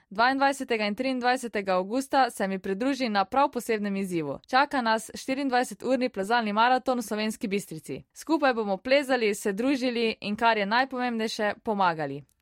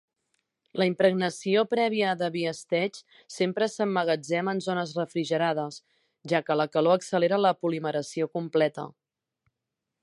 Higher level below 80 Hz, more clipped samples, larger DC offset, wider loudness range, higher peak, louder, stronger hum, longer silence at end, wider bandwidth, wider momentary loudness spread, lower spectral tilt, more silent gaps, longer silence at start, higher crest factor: first, -66 dBFS vs -78 dBFS; neither; neither; about the same, 1 LU vs 2 LU; about the same, -10 dBFS vs -8 dBFS; about the same, -26 LUFS vs -27 LUFS; neither; second, 0.2 s vs 1.15 s; first, 16 kHz vs 11.5 kHz; about the same, 8 LU vs 9 LU; about the same, -4.5 dB/octave vs -5.5 dB/octave; neither; second, 0.1 s vs 0.75 s; about the same, 16 dB vs 20 dB